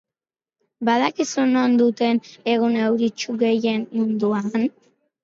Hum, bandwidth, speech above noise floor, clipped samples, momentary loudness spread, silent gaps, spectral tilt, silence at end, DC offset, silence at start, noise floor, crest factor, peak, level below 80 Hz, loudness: none; 7.6 kHz; over 70 dB; under 0.1%; 6 LU; none; -5 dB/octave; 0.55 s; under 0.1%; 0.8 s; under -90 dBFS; 16 dB; -6 dBFS; -72 dBFS; -21 LUFS